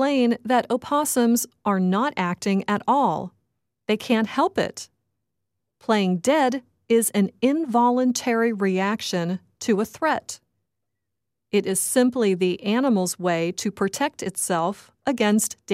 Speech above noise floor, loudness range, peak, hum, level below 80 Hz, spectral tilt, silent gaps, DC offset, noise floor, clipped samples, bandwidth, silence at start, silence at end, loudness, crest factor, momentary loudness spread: 61 dB; 4 LU; -8 dBFS; none; -68 dBFS; -4.5 dB/octave; none; under 0.1%; -83 dBFS; under 0.1%; 16 kHz; 0 s; 0 s; -23 LUFS; 16 dB; 8 LU